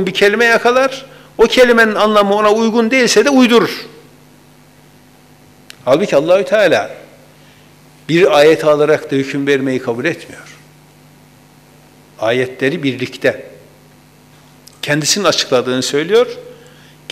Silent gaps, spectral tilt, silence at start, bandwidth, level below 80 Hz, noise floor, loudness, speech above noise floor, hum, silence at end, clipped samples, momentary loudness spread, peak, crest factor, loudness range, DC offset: none; -4 dB/octave; 0 s; 16 kHz; -52 dBFS; -44 dBFS; -12 LUFS; 32 dB; 50 Hz at -45 dBFS; 0.6 s; under 0.1%; 14 LU; 0 dBFS; 14 dB; 9 LU; under 0.1%